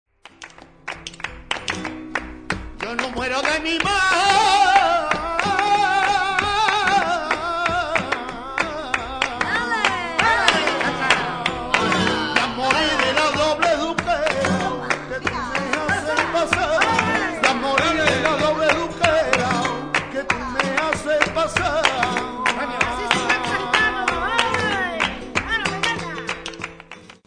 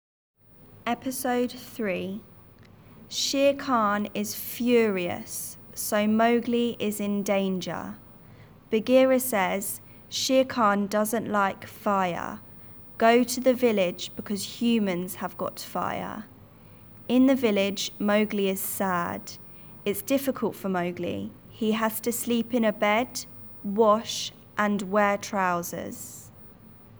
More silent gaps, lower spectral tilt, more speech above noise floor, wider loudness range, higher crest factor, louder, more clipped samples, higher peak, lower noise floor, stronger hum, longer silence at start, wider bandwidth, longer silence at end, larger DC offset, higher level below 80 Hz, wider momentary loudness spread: neither; second, -3 dB/octave vs -4.5 dB/octave; second, 23 dB vs 27 dB; about the same, 4 LU vs 4 LU; about the same, 20 dB vs 18 dB; first, -20 LUFS vs -26 LUFS; neither; first, 0 dBFS vs -8 dBFS; second, -43 dBFS vs -52 dBFS; neither; second, 0.4 s vs 0.75 s; second, 10 kHz vs over 20 kHz; first, 0.15 s vs 0 s; neither; first, -44 dBFS vs -64 dBFS; second, 10 LU vs 14 LU